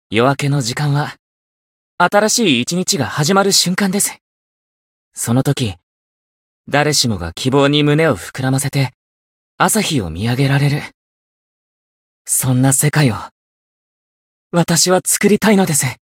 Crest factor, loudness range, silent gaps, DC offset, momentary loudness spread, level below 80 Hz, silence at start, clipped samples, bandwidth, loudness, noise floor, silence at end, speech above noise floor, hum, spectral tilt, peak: 16 dB; 4 LU; 1.19-1.98 s, 4.21-5.11 s, 5.83-6.64 s, 8.94-9.58 s, 10.94-12.25 s, 13.31-14.50 s; under 0.1%; 8 LU; -48 dBFS; 0.1 s; under 0.1%; 16.5 kHz; -15 LUFS; under -90 dBFS; 0.2 s; over 75 dB; none; -4 dB/octave; 0 dBFS